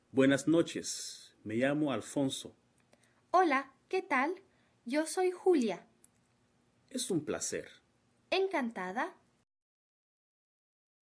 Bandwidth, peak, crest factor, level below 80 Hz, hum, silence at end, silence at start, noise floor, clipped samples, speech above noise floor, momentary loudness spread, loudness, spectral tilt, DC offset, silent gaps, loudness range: 11 kHz; -16 dBFS; 20 dB; -78 dBFS; none; 1.95 s; 0.15 s; -72 dBFS; under 0.1%; 40 dB; 14 LU; -33 LUFS; -4 dB/octave; under 0.1%; none; 6 LU